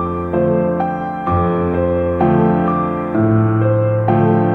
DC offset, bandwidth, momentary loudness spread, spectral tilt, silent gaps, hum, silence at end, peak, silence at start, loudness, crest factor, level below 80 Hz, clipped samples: under 0.1%; 3.9 kHz; 5 LU; -11.5 dB/octave; none; none; 0 s; -2 dBFS; 0 s; -16 LUFS; 14 dB; -38 dBFS; under 0.1%